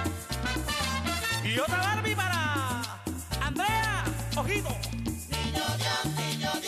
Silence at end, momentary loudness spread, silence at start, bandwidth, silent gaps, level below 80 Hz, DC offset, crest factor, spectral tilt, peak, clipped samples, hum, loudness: 0 s; 6 LU; 0 s; 15.5 kHz; none; -42 dBFS; under 0.1%; 12 dB; -4 dB/octave; -18 dBFS; under 0.1%; none; -29 LUFS